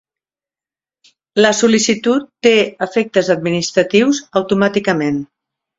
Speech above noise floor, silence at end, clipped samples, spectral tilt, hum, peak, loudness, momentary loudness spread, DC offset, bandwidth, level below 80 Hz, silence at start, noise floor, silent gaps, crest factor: over 76 dB; 0.55 s; under 0.1%; -4 dB/octave; none; 0 dBFS; -15 LUFS; 5 LU; under 0.1%; 8 kHz; -56 dBFS; 1.35 s; under -90 dBFS; none; 16 dB